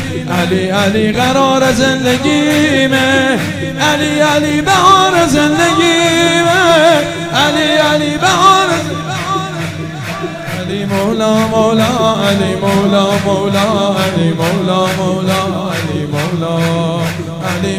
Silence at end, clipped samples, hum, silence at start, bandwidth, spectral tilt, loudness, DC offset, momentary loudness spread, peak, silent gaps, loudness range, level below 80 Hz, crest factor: 0 s; under 0.1%; none; 0 s; 16 kHz; -4.5 dB/octave; -12 LUFS; 0.4%; 10 LU; 0 dBFS; none; 5 LU; -44 dBFS; 12 dB